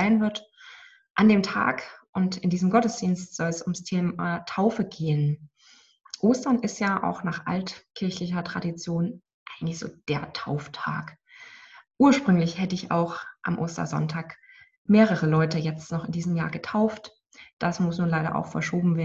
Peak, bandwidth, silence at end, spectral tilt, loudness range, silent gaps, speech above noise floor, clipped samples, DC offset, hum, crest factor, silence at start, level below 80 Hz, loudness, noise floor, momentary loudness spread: -6 dBFS; 8 kHz; 0 s; -6.5 dB/octave; 6 LU; 1.10-1.15 s, 2.09-2.13 s, 9.34-9.46 s, 14.77-14.85 s, 17.53-17.57 s; 33 dB; under 0.1%; under 0.1%; none; 20 dB; 0 s; -60 dBFS; -26 LUFS; -58 dBFS; 14 LU